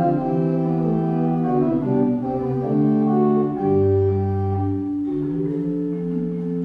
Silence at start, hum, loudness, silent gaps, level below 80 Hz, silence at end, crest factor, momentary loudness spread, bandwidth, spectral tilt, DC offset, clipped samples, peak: 0 s; none; -21 LUFS; none; -50 dBFS; 0 s; 12 dB; 6 LU; 4.9 kHz; -12 dB/octave; under 0.1%; under 0.1%; -8 dBFS